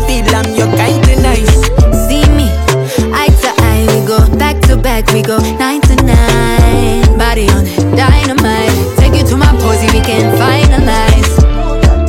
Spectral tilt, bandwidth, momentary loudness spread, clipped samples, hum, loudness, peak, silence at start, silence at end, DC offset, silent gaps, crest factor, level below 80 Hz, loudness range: -5.5 dB/octave; 17 kHz; 3 LU; 0.3%; none; -9 LUFS; 0 dBFS; 0 s; 0 s; under 0.1%; none; 8 dB; -12 dBFS; 1 LU